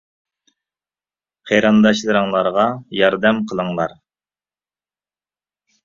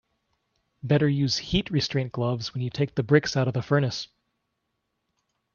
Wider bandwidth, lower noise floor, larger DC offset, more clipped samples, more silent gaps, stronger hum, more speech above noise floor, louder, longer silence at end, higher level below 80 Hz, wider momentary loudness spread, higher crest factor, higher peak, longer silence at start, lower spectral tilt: about the same, 7.4 kHz vs 7.2 kHz; first, under -90 dBFS vs -78 dBFS; neither; neither; neither; first, 50 Hz at -45 dBFS vs none; first, over 74 dB vs 54 dB; first, -17 LUFS vs -25 LUFS; first, 1.95 s vs 1.5 s; second, -58 dBFS vs -52 dBFS; about the same, 9 LU vs 8 LU; about the same, 20 dB vs 22 dB; first, 0 dBFS vs -6 dBFS; first, 1.45 s vs 0.85 s; about the same, -5.5 dB/octave vs -6 dB/octave